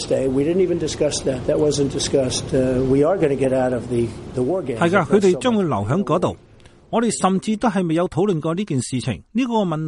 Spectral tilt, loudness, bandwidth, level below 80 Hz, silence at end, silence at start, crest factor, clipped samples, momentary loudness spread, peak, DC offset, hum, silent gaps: -5.5 dB/octave; -20 LUFS; 11.5 kHz; -44 dBFS; 0 s; 0 s; 16 dB; under 0.1%; 6 LU; -2 dBFS; under 0.1%; none; none